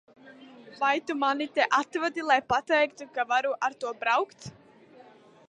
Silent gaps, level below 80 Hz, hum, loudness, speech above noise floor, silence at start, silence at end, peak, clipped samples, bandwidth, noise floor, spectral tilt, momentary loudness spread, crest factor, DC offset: none; -70 dBFS; none; -27 LUFS; 27 dB; 0.25 s; 1 s; -8 dBFS; under 0.1%; 10.5 kHz; -54 dBFS; -3.5 dB/octave; 7 LU; 20 dB; under 0.1%